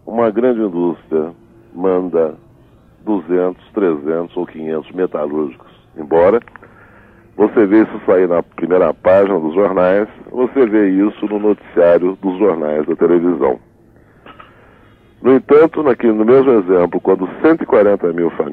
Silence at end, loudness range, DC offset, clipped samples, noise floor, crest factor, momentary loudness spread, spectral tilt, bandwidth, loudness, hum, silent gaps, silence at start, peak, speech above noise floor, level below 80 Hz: 0 s; 6 LU; under 0.1%; under 0.1%; -47 dBFS; 12 dB; 10 LU; -10 dB/octave; 4.3 kHz; -14 LUFS; none; none; 0.05 s; -2 dBFS; 34 dB; -52 dBFS